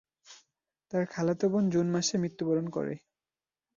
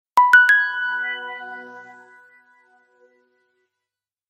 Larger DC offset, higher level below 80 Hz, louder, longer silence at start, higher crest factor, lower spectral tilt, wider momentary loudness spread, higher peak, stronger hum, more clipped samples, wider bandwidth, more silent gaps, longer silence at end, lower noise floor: neither; first, -70 dBFS vs -80 dBFS; second, -30 LUFS vs -16 LUFS; first, 0.3 s vs 0.15 s; second, 14 dB vs 20 dB; first, -5.5 dB/octave vs 0.5 dB/octave; second, 8 LU vs 24 LU; second, -16 dBFS vs -2 dBFS; neither; neither; second, 7.4 kHz vs 15.5 kHz; neither; second, 0.8 s vs 2.5 s; about the same, under -90 dBFS vs -87 dBFS